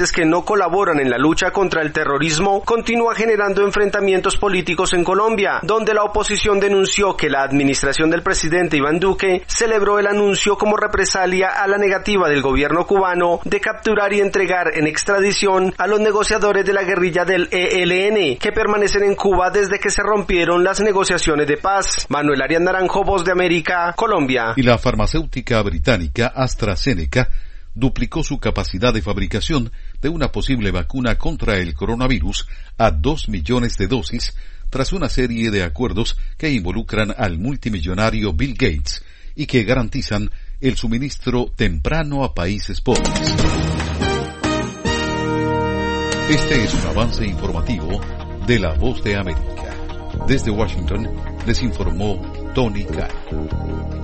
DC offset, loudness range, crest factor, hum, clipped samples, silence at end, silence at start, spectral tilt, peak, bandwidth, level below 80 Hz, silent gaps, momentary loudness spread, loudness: under 0.1%; 5 LU; 18 dB; none; under 0.1%; 0 s; 0 s; -4.5 dB/octave; 0 dBFS; 8.8 kHz; -26 dBFS; none; 8 LU; -18 LUFS